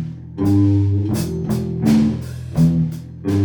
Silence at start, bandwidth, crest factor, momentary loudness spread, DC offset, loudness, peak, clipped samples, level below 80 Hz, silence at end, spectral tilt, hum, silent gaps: 0 s; 19 kHz; 14 dB; 10 LU; under 0.1%; -18 LUFS; -4 dBFS; under 0.1%; -40 dBFS; 0 s; -8 dB/octave; none; none